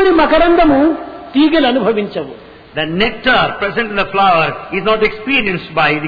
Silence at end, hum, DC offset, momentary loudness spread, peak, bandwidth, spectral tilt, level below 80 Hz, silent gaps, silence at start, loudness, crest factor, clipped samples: 0 s; none; under 0.1%; 10 LU; -2 dBFS; 5 kHz; -7.5 dB/octave; -34 dBFS; none; 0 s; -13 LUFS; 12 dB; under 0.1%